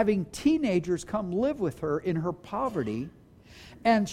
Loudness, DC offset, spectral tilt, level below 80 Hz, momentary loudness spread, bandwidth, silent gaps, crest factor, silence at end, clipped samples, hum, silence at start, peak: -29 LUFS; under 0.1%; -6.5 dB/octave; -54 dBFS; 8 LU; 15 kHz; none; 16 dB; 0 s; under 0.1%; none; 0 s; -12 dBFS